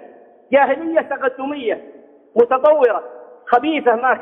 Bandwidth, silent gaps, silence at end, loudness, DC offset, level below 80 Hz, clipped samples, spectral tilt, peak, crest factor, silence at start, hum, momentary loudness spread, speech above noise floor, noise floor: 4 kHz; none; 0 s; -17 LUFS; under 0.1%; -66 dBFS; under 0.1%; -6.5 dB/octave; -2 dBFS; 16 dB; 0 s; none; 11 LU; 28 dB; -44 dBFS